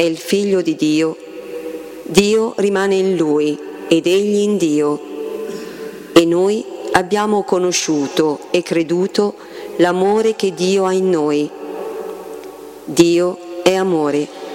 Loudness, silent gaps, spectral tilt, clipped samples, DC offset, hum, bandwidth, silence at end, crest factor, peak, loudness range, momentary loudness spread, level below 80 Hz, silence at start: -16 LUFS; none; -4.5 dB/octave; under 0.1%; under 0.1%; none; 16.5 kHz; 0 s; 16 dB; 0 dBFS; 2 LU; 15 LU; -54 dBFS; 0 s